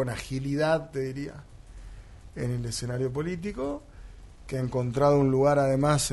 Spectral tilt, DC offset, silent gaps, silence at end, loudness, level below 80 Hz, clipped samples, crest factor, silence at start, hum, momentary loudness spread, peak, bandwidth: -6 dB/octave; under 0.1%; none; 0 s; -27 LUFS; -46 dBFS; under 0.1%; 18 dB; 0 s; none; 18 LU; -10 dBFS; 11.5 kHz